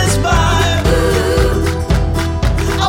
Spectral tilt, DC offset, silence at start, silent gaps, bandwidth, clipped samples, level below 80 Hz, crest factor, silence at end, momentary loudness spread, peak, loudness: -5 dB/octave; under 0.1%; 0 s; none; 17 kHz; under 0.1%; -18 dBFS; 12 dB; 0 s; 4 LU; 0 dBFS; -14 LUFS